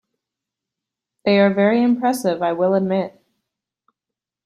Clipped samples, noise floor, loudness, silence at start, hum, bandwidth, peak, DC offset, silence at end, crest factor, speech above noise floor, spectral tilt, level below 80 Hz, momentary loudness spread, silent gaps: under 0.1%; -86 dBFS; -18 LUFS; 1.25 s; none; 13.5 kHz; -4 dBFS; under 0.1%; 1.35 s; 18 dB; 69 dB; -6.5 dB/octave; -66 dBFS; 8 LU; none